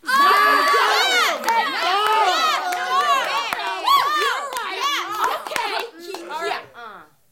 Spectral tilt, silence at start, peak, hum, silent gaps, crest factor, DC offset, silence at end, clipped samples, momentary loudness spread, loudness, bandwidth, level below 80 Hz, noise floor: 0 dB/octave; 0.05 s; -2 dBFS; none; none; 18 dB; under 0.1%; 0.3 s; under 0.1%; 13 LU; -19 LUFS; 17 kHz; -66 dBFS; -41 dBFS